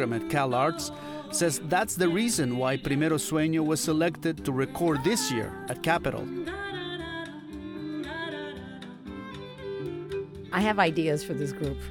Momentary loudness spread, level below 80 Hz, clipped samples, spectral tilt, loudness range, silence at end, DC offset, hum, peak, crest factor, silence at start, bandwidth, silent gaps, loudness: 14 LU; -52 dBFS; under 0.1%; -4.5 dB/octave; 10 LU; 0 s; under 0.1%; none; -10 dBFS; 18 dB; 0 s; 19.5 kHz; none; -28 LUFS